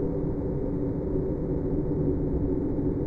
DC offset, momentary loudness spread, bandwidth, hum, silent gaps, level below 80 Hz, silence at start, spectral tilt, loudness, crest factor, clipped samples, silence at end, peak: under 0.1%; 2 LU; 2.5 kHz; none; none; -36 dBFS; 0 s; -13 dB/octave; -29 LUFS; 12 dB; under 0.1%; 0 s; -14 dBFS